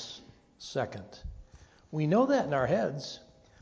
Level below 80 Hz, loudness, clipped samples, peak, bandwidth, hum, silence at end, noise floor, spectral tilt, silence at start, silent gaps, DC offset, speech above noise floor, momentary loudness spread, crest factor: -54 dBFS; -30 LUFS; under 0.1%; -14 dBFS; 8 kHz; none; 0.4 s; -57 dBFS; -6.5 dB/octave; 0 s; none; under 0.1%; 27 dB; 21 LU; 18 dB